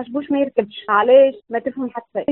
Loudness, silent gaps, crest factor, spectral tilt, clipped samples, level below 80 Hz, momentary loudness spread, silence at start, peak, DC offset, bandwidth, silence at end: -18 LUFS; none; 16 dB; -3 dB/octave; under 0.1%; -64 dBFS; 13 LU; 0 s; -2 dBFS; under 0.1%; 4 kHz; 0 s